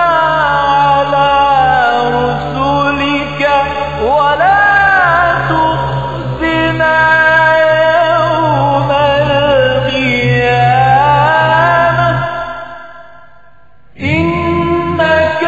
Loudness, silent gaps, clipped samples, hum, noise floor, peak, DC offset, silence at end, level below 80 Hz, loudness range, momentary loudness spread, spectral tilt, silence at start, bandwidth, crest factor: -10 LUFS; none; under 0.1%; none; -47 dBFS; 0 dBFS; 1%; 0 s; -34 dBFS; 4 LU; 8 LU; -3.5 dB/octave; 0 s; 8 kHz; 10 dB